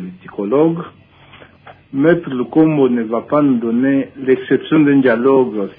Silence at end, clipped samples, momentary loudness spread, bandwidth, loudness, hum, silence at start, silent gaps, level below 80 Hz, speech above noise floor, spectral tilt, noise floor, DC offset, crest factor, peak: 0.05 s; under 0.1%; 9 LU; 3.8 kHz; -14 LUFS; none; 0 s; none; -58 dBFS; 29 dB; -11.5 dB/octave; -43 dBFS; under 0.1%; 14 dB; -2 dBFS